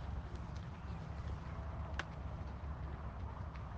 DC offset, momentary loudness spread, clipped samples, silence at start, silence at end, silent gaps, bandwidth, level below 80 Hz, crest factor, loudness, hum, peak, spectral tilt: under 0.1%; 3 LU; under 0.1%; 0 s; 0 s; none; 7.8 kHz; -48 dBFS; 20 dB; -47 LUFS; none; -24 dBFS; -7 dB/octave